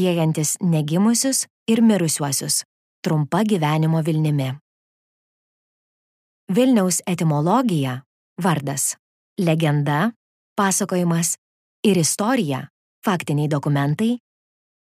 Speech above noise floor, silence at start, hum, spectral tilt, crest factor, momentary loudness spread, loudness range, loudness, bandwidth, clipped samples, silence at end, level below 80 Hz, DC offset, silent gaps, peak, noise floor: over 71 dB; 0 s; none; -5 dB/octave; 16 dB; 9 LU; 3 LU; -20 LUFS; 15.5 kHz; under 0.1%; 0.65 s; -68 dBFS; under 0.1%; 1.50-1.66 s, 2.65-3.03 s, 4.61-6.47 s, 8.06-8.36 s, 8.99-9.36 s, 10.16-10.56 s, 11.38-11.83 s, 12.70-13.02 s; -4 dBFS; under -90 dBFS